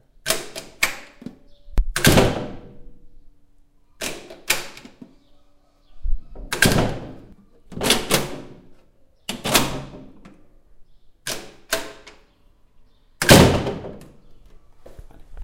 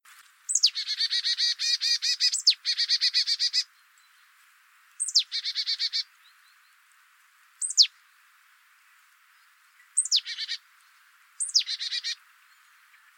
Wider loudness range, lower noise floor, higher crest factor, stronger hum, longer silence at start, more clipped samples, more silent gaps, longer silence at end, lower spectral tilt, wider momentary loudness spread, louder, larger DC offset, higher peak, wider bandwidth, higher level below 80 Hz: first, 11 LU vs 6 LU; second, -55 dBFS vs -60 dBFS; about the same, 24 dB vs 24 dB; neither; second, 0.25 s vs 0.5 s; neither; neither; second, 0 s vs 1.05 s; first, -3.5 dB/octave vs 12.5 dB/octave; first, 23 LU vs 12 LU; first, -20 LUFS vs -24 LUFS; neither; first, 0 dBFS vs -6 dBFS; about the same, 16.5 kHz vs 17.5 kHz; first, -34 dBFS vs under -90 dBFS